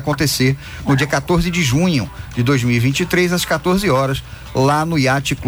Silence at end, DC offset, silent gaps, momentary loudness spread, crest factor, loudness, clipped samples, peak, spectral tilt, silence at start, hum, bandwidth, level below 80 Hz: 0 s; under 0.1%; none; 6 LU; 12 dB; -17 LUFS; under 0.1%; -4 dBFS; -5 dB/octave; 0 s; none; over 20 kHz; -36 dBFS